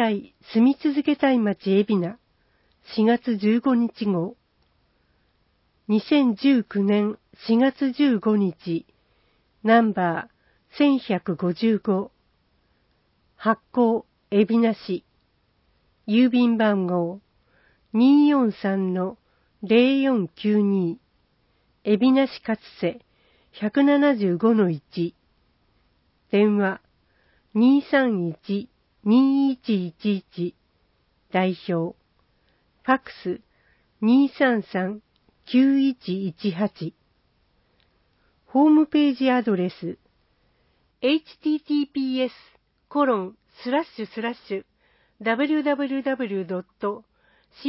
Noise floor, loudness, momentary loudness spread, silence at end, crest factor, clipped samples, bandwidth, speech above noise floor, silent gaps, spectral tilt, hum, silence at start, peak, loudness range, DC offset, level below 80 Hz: -66 dBFS; -22 LUFS; 13 LU; 0 s; 18 dB; under 0.1%; 5.8 kHz; 45 dB; none; -11 dB/octave; none; 0 s; -6 dBFS; 5 LU; under 0.1%; -68 dBFS